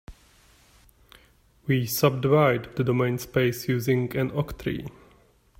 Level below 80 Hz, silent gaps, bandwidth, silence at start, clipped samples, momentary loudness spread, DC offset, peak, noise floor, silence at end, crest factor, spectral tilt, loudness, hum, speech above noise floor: -52 dBFS; none; 16 kHz; 0.1 s; under 0.1%; 11 LU; under 0.1%; -6 dBFS; -59 dBFS; 0.7 s; 20 dB; -6 dB/octave; -25 LUFS; none; 35 dB